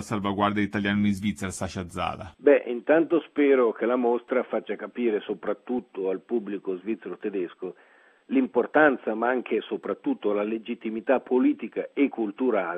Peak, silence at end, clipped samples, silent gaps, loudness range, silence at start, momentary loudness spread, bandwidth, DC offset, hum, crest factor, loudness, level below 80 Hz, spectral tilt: -4 dBFS; 0 s; under 0.1%; none; 6 LU; 0 s; 11 LU; 13 kHz; under 0.1%; none; 22 dB; -26 LUFS; -62 dBFS; -6 dB/octave